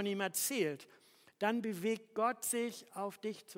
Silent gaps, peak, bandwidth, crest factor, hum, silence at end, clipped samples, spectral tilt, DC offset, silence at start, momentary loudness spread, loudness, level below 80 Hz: none; -20 dBFS; 16.5 kHz; 18 dB; none; 0.05 s; under 0.1%; -3 dB/octave; under 0.1%; 0 s; 9 LU; -37 LUFS; under -90 dBFS